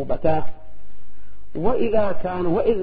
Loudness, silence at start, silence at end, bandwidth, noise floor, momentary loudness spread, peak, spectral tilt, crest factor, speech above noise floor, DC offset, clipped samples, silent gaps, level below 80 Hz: -23 LUFS; 0 s; 0 s; 4.9 kHz; -42 dBFS; 9 LU; -4 dBFS; -12 dB/octave; 14 dB; 25 dB; under 0.1%; under 0.1%; none; -40 dBFS